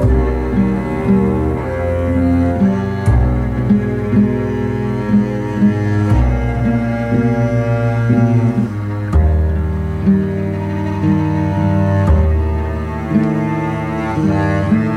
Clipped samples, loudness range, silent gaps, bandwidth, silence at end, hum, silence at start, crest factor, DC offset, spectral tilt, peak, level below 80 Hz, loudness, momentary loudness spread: under 0.1%; 1 LU; none; 10 kHz; 0 s; none; 0 s; 12 dB; under 0.1%; -9.5 dB/octave; -2 dBFS; -22 dBFS; -16 LUFS; 5 LU